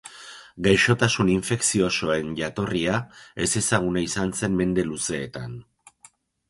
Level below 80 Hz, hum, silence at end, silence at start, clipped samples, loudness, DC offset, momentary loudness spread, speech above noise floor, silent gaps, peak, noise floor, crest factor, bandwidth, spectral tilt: -48 dBFS; none; 0.9 s; 0.05 s; under 0.1%; -23 LUFS; under 0.1%; 17 LU; 32 dB; none; -4 dBFS; -56 dBFS; 20 dB; 11.5 kHz; -4 dB/octave